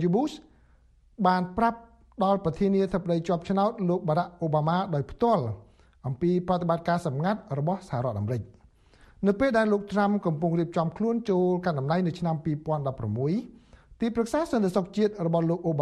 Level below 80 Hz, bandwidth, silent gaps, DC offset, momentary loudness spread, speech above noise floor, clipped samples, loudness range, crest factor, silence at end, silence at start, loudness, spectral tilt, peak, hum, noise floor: -54 dBFS; 11.5 kHz; none; under 0.1%; 6 LU; 33 dB; under 0.1%; 3 LU; 18 dB; 0 s; 0 s; -27 LUFS; -8 dB/octave; -8 dBFS; none; -59 dBFS